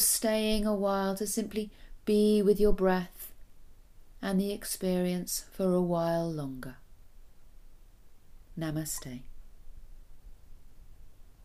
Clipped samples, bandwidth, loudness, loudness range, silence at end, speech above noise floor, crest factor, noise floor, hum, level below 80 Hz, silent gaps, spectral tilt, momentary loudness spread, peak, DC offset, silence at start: under 0.1%; 15.5 kHz; -30 LUFS; 13 LU; 0 s; 23 dB; 18 dB; -52 dBFS; none; -46 dBFS; none; -4.5 dB/octave; 18 LU; -14 dBFS; under 0.1%; 0 s